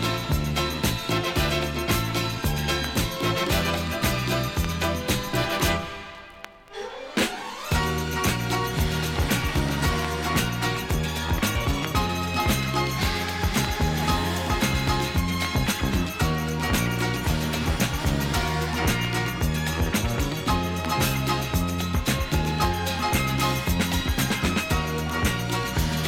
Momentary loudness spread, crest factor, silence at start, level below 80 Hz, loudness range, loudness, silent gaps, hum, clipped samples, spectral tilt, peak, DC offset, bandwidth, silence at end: 3 LU; 16 dB; 0 s; -32 dBFS; 2 LU; -25 LUFS; none; none; under 0.1%; -4.5 dB/octave; -8 dBFS; under 0.1%; 17.5 kHz; 0 s